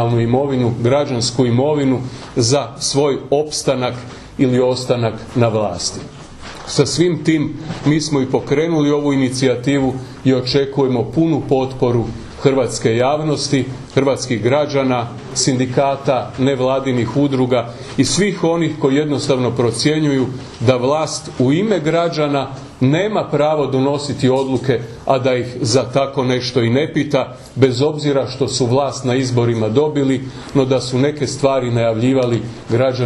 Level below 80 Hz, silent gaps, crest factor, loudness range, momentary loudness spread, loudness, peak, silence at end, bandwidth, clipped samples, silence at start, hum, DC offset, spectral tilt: -44 dBFS; none; 16 dB; 1 LU; 5 LU; -17 LUFS; 0 dBFS; 0 s; 11.5 kHz; under 0.1%; 0 s; none; under 0.1%; -5.5 dB/octave